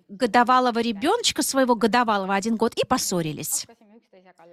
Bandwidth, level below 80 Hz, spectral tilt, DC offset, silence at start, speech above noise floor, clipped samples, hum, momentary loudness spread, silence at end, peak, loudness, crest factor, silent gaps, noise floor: 16 kHz; -60 dBFS; -3 dB/octave; under 0.1%; 0.1 s; 31 dB; under 0.1%; none; 8 LU; 0.9 s; -6 dBFS; -22 LUFS; 16 dB; none; -53 dBFS